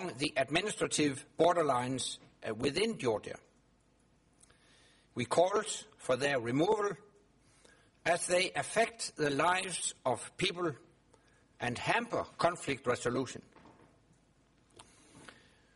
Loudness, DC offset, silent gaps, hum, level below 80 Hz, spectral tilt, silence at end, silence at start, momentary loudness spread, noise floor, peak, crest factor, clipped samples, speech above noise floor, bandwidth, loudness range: -33 LUFS; under 0.1%; none; none; -68 dBFS; -3.5 dB/octave; 0.5 s; 0 s; 10 LU; -69 dBFS; -14 dBFS; 20 dB; under 0.1%; 36 dB; 11.5 kHz; 5 LU